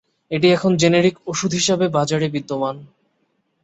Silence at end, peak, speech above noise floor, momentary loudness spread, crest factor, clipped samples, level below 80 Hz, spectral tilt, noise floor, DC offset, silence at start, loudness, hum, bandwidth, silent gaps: 0.8 s; -2 dBFS; 50 dB; 10 LU; 16 dB; under 0.1%; -58 dBFS; -4.5 dB/octave; -68 dBFS; under 0.1%; 0.3 s; -18 LUFS; none; 8.2 kHz; none